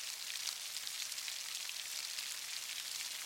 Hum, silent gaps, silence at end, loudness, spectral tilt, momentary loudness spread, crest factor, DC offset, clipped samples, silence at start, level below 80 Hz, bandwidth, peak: none; none; 0 s; -40 LUFS; 3.5 dB/octave; 1 LU; 24 dB; under 0.1%; under 0.1%; 0 s; under -90 dBFS; 17 kHz; -20 dBFS